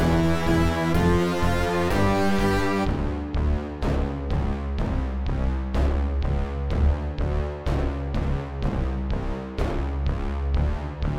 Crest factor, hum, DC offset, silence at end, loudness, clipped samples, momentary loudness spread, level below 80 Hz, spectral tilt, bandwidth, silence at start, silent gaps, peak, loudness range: 14 dB; none; under 0.1%; 0 s; -25 LUFS; under 0.1%; 6 LU; -26 dBFS; -7 dB/octave; 15.5 kHz; 0 s; none; -10 dBFS; 5 LU